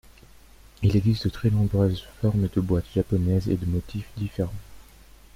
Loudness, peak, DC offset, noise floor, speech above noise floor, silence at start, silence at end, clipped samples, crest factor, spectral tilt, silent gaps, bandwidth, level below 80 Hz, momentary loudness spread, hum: -25 LUFS; -10 dBFS; under 0.1%; -50 dBFS; 26 dB; 0.8 s; 0.55 s; under 0.1%; 16 dB; -8.5 dB/octave; none; 15.5 kHz; -42 dBFS; 10 LU; none